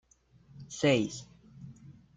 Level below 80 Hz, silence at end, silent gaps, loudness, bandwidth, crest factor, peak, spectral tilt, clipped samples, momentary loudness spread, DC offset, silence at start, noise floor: -66 dBFS; 0.25 s; none; -29 LUFS; 9.4 kHz; 20 dB; -14 dBFS; -5 dB/octave; under 0.1%; 24 LU; under 0.1%; 0.6 s; -62 dBFS